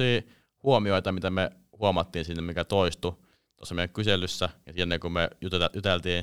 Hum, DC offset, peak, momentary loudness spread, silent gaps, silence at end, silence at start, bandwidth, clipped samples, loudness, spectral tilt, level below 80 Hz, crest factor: none; 0.4%; -8 dBFS; 7 LU; none; 0 s; 0 s; 15.5 kHz; under 0.1%; -28 LUFS; -5.5 dB/octave; -52 dBFS; 20 dB